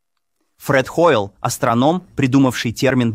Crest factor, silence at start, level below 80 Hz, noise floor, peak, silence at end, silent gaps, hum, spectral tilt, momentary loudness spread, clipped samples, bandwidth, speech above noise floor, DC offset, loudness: 16 dB; 0.6 s; -50 dBFS; -73 dBFS; -2 dBFS; 0 s; none; none; -5.5 dB/octave; 5 LU; under 0.1%; 16 kHz; 56 dB; under 0.1%; -17 LUFS